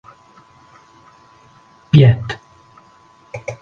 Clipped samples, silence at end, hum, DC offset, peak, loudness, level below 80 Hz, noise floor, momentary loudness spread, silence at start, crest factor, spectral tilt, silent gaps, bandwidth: under 0.1%; 0.1 s; none; under 0.1%; 0 dBFS; -13 LUFS; -46 dBFS; -49 dBFS; 21 LU; 1.95 s; 20 dB; -8 dB/octave; none; 7 kHz